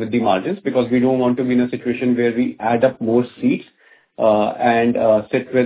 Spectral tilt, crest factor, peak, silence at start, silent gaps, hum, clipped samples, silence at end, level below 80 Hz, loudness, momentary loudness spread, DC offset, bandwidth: -11 dB/octave; 16 dB; -2 dBFS; 0 s; none; none; under 0.1%; 0 s; -56 dBFS; -18 LUFS; 5 LU; under 0.1%; 4 kHz